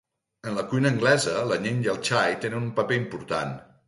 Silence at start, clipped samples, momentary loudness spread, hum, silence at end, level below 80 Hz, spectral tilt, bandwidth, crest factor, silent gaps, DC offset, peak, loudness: 0.45 s; under 0.1%; 10 LU; none; 0.25 s; -62 dBFS; -5 dB/octave; 11.5 kHz; 18 dB; none; under 0.1%; -8 dBFS; -25 LUFS